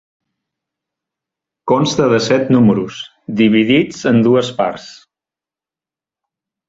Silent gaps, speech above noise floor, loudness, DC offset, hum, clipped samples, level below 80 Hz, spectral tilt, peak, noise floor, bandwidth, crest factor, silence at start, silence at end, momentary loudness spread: none; 76 dB; -14 LUFS; under 0.1%; none; under 0.1%; -54 dBFS; -6 dB/octave; 0 dBFS; -89 dBFS; 7.8 kHz; 16 dB; 1.65 s; 1.75 s; 14 LU